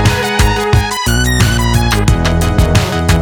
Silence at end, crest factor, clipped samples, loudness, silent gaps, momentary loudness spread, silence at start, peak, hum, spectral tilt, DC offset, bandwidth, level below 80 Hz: 0 s; 10 dB; under 0.1%; -12 LUFS; none; 2 LU; 0 s; 0 dBFS; none; -5 dB/octave; under 0.1%; over 20 kHz; -16 dBFS